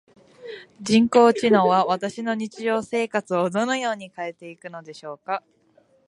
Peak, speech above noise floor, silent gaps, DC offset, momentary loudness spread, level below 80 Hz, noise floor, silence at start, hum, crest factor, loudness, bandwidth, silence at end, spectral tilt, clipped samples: -2 dBFS; 38 dB; none; under 0.1%; 21 LU; -66 dBFS; -60 dBFS; 0.4 s; none; 20 dB; -21 LUFS; 11 kHz; 0.7 s; -5 dB/octave; under 0.1%